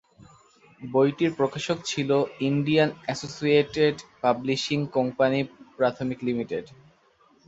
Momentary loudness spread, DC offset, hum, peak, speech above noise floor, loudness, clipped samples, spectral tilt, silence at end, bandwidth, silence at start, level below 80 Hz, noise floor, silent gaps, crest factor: 8 LU; under 0.1%; none; -6 dBFS; 36 dB; -25 LUFS; under 0.1%; -5.5 dB/octave; 0.8 s; 8 kHz; 0.8 s; -62 dBFS; -61 dBFS; none; 18 dB